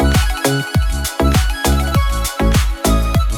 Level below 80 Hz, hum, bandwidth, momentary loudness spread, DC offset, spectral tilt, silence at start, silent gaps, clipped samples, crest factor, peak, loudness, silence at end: -18 dBFS; none; 18 kHz; 3 LU; under 0.1%; -5 dB/octave; 0 s; none; under 0.1%; 14 dB; 0 dBFS; -16 LUFS; 0 s